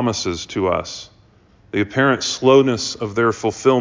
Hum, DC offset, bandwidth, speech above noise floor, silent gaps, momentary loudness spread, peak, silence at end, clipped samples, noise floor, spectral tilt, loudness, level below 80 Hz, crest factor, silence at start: none; under 0.1%; 7.6 kHz; 34 dB; none; 10 LU; -2 dBFS; 0 s; under 0.1%; -52 dBFS; -4.5 dB/octave; -18 LUFS; -46 dBFS; 18 dB; 0 s